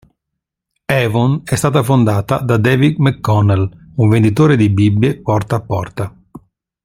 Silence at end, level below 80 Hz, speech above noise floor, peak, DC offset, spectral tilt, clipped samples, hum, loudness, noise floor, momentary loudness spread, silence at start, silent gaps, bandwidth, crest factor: 0.45 s; -44 dBFS; 65 dB; 0 dBFS; under 0.1%; -7 dB/octave; under 0.1%; none; -14 LUFS; -78 dBFS; 9 LU; 0.9 s; none; 15.5 kHz; 14 dB